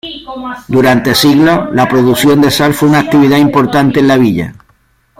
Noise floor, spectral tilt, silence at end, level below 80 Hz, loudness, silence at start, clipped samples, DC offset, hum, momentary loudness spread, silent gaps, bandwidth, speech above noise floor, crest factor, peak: -52 dBFS; -5.5 dB/octave; 0.65 s; -42 dBFS; -9 LUFS; 0.05 s; under 0.1%; under 0.1%; none; 13 LU; none; 16.5 kHz; 44 dB; 10 dB; 0 dBFS